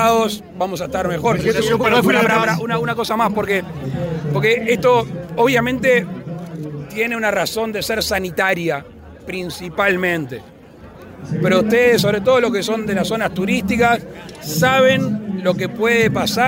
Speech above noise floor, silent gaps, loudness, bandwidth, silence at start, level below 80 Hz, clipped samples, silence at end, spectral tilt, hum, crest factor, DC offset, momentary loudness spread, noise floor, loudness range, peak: 23 dB; none; -17 LUFS; 16.5 kHz; 0 s; -46 dBFS; under 0.1%; 0 s; -5 dB/octave; none; 14 dB; under 0.1%; 13 LU; -40 dBFS; 4 LU; -4 dBFS